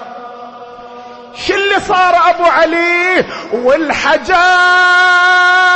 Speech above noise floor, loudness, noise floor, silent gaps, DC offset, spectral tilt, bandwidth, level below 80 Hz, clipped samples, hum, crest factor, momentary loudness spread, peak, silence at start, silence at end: 21 dB; -9 LUFS; -31 dBFS; none; under 0.1%; -2.5 dB/octave; 8.8 kHz; -44 dBFS; under 0.1%; none; 10 dB; 21 LU; 0 dBFS; 0 s; 0 s